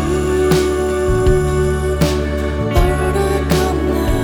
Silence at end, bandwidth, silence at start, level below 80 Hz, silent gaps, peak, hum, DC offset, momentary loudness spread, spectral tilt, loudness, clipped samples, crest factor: 0 s; over 20 kHz; 0 s; -22 dBFS; none; -2 dBFS; none; under 0.1%; 3 LU; -6 dB/octave; -16 LUFS; under 0.1%; 14 dB